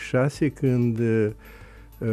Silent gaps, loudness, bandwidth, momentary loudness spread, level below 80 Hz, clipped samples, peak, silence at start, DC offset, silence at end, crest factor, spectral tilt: none; -24 LUFS; 12.5 kHz; 8 LU; -48 dBFS; under 0.1%; -10 dBFS; 0 s; under 0.1%; 0 s; 14 dB; -8 dB/octave